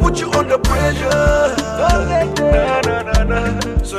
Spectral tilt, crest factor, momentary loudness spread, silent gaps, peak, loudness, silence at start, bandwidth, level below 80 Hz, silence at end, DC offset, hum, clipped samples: -5.5 dB/octave; 12 dB; 4 LU; none; -4 dBFS; -16 LUFS; 0 s; 15 kHz; -20 dBFS; 0 s; under 0.1%; none; under 0.1%